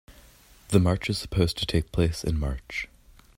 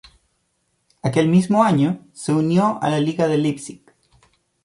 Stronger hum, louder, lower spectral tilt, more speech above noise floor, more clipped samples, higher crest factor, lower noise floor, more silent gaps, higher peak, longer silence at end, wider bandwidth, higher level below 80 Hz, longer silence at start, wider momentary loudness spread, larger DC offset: neither; second, -27 LUFS vs -19 LUFS; about the same, -6 dB/octave vs -7 dB/octave; second, 29 dB vs 51 dB; neither; about the same, 22 dB vs 18 dB; second, -54 dBFS vs -69 dBFS; neither; about the same, -4 dBFS vs -2 dBFS; second, 0.5 s vs 0.9 s; first, 16 kHz vs 11.5 kHz; first, -38 dBFS vs -60 dBFS; second, 0.1 s vs 1.05 s; about the same, 11 LU vs 11 LU; neither